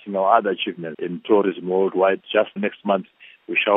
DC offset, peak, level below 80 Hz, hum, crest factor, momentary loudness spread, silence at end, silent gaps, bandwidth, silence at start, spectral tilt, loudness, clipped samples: under 0.1%; -2 dBFS; -78 dBFS; none; 20 dB; 9 LU; 0 s; none; 3.9 kHz; 0.05 s; -9.5 dB/octave; -21 LUFS; under 0.1%